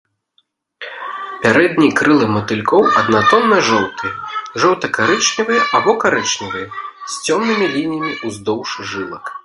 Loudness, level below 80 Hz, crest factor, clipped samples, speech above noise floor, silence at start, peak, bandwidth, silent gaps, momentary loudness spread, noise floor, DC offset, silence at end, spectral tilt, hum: -15 LUFS; -54 dBFS; 16 dB; under 0.1%; 47 dB; 0.8 s; 0 dBFS; 11.5 kHz; none; 14 LU; -62 dBFS; under 0.1%; 0.05 s; -3.5 dB/octave; none